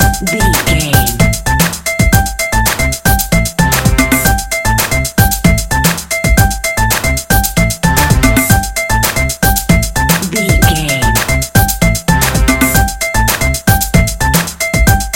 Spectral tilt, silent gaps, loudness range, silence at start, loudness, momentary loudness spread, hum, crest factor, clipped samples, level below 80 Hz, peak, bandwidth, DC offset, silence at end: -4 dB/octave; none; 1 LU; 0 s; -11 LUFS; 3 LU; none; 10 dB; 0.8%; -18 dBFS; 0 dBFS; over 20 kHz; under 0.1%; 0 s